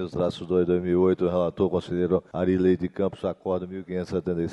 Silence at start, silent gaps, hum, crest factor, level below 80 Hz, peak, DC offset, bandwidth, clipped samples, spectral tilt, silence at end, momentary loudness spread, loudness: 0 s; none; none; 16 dB; -54 dBFS; -8 dBFS; under 0.1%; 8.6 kHz; under 0.1%; -8.5 dB/octave; 0 s; 8 LU; -25 LUFS